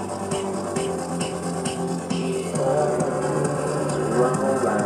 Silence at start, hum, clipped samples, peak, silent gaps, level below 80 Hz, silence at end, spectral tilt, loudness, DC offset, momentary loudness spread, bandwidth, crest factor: 0 s; none; under 0.1%; -8 dBFS; none; -54 dBFS; 0 s; -5.5 dB/octave; -24 LUFS; under 0.1%; 6 LU; 13.5 kHz; 14 dB